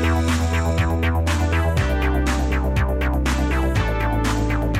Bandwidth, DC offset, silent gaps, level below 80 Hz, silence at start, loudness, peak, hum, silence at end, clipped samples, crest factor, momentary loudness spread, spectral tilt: 15.5 kHz; under 0.1%; none; -22 dBFS; 0 s; -21 LUFS; -8 dBFS; none; 0 s; under 0.1%; 12 dB; 1 LU; -6 dB/octave